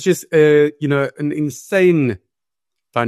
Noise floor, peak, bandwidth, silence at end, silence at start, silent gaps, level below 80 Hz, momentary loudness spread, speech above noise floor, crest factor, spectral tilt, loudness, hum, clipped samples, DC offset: -85 dBFS; -2 dBFS; 13 kHz; 0 s; 0 s; none; -60 dBFS; 10 LU; 70 dB; 14 dB; -6.5 dB/octave; -16 LUFS; none; under 0.1%; under 0.1%